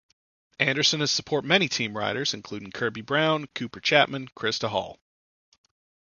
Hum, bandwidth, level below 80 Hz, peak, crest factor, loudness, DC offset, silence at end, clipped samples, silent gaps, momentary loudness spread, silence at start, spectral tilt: none; 7.4 kHz; -64 dBFS; -4 dBFS; 24 dB; -25 LUFS; under 0.1%; 1.2 s; under 0.1%; none; 10 LU; 0.6 s; -3 dB/octave